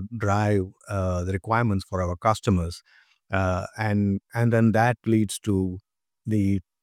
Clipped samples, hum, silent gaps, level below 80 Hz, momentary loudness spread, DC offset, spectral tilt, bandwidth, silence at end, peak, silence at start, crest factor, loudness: under 0.1%; none; none; -48 dBFS; 9 LU; under 0.1%; -7 dB/octave; 14 kHz; 0.2 s; -6 dBFS; 0 s; 18 dB; -25 LUFS